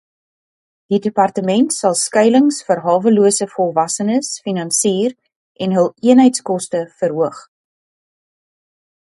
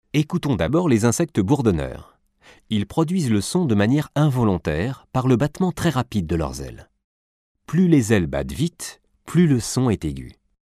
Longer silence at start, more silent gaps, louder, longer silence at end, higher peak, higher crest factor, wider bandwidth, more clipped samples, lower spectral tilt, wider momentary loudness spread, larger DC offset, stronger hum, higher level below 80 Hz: first, 0.9 s vs 0.15 s; second, 5.36-5.55 s vs 7.04-7.55 s; first, -15 LUFS vs -21 LUFS; first, 1.7 s vs 0.5 s; first, 0 dBFS vs -4 dBFS; about the same, 16 dB vs 18 dB; second, 11.5 kHz vs 15 kHz; neither; second, -4.5 dB/octave vs -6.5 dB/octave; about the same, 9 LU vs 9 LU; neither; neither; second, -66 dBFS vs -42 dBFS